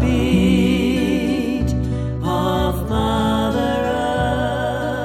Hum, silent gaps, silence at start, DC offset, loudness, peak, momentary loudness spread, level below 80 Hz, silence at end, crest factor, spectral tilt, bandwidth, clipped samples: none; none; 0 s; under 0.1%; -19 LUFS; -4 dBFS; 6 LU; -28 dBFS; 0 s; 14 dB; -6.5 dB/octave; 16 kHz; under 0.1%